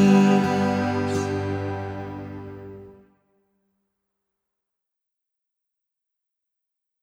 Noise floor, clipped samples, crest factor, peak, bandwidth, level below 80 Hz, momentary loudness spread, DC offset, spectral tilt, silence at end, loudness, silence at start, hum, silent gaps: -84 dBFS; under 0.1%; 20 dB; -6 dBFS; 11 kHz; -62 dBFS; 22 LU; under 0.1%; -7 dB/octave; 4.1 s; -23 LUFS; 0 s; none; none